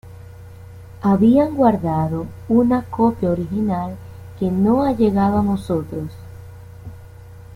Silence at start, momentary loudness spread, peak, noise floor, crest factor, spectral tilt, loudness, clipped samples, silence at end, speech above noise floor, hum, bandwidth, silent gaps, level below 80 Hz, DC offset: 0.05 s; 24 LU; -4 dBFS; -39 dBFS; 16 dB; -9.5 dB/octave; -18 LUFS; under 0.1%; 0 s; 22 dB; none; 15 kHz; none; -44 dBFS; under 0.1%